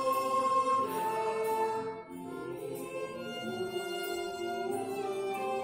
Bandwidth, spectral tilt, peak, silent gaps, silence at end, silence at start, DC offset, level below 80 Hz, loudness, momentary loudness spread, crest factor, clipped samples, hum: 16 kHz; -4 dB/octave; -18 dBFS; none; 0 s; 0 s; under 0.1%; -72 dBFS; -34 LUFS; 11 LU; 14 dB; under 0.1%; none